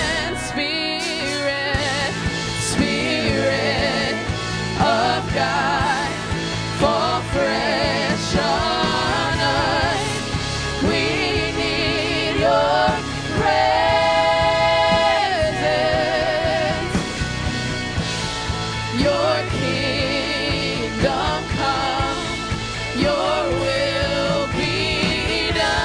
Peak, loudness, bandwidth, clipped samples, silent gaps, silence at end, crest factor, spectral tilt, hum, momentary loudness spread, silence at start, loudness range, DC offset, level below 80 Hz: -4 dBFS; -20 LUFS; 10.5 kHz; under 0.1%; none; 0 s; 16 dB; -4 dB/octave; none; 7 LU; 0 s; 4 LU; under 0.1%; -36 dBFS